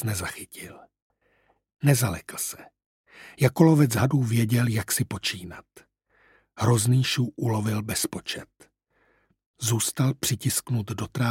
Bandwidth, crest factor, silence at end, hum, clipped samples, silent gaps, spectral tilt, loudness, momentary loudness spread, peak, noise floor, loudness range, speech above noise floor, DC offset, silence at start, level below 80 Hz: 16.5 kHz; 22 dB; 0 s; none; under 0.1%; 1.02-1.10 s, 2.86-3.04 s, 9.46-9.54 s; -5 dB/octave; -25 LUFS; 16 LU; -4 dBFS; -67 dBFS; 5 LU; 42 dB; under 0.1%; 0 s; -56 dBFS